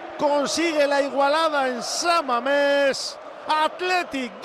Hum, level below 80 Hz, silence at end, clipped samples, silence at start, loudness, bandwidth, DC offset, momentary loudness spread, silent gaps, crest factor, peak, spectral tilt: none; -66 dBFS; 0 s; under 0.1%; 0 s; -22 LUFS; 15 kHz; under 0.1%; 5 LU; none; 12 dB; -10 dBFS; -1.5 dB/octave